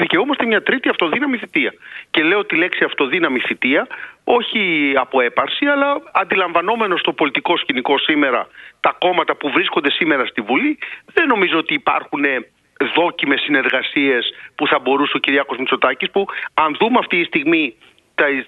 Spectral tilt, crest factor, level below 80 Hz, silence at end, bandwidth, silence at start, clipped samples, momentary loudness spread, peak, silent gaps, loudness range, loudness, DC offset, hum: -6 dB/octave; 18 dB; -62 dBFS; 0 s; 4.9 kHz; 0 s; under 0.1%; 5 LU; 0 dBFS; none; 1 LU; -17 LUFS; under 0.1%; none